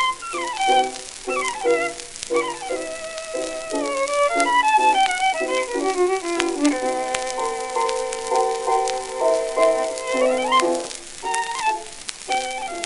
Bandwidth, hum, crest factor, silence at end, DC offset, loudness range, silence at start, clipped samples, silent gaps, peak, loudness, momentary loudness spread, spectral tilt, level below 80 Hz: 12 kHz; none; 22 dB; 0 s; under 0.1%; 4 LU; 0 s; under 0.1%; none; 0 dBFS; -22 LUFS; 10 LU; -1.5 dB/octave; -52 dBFS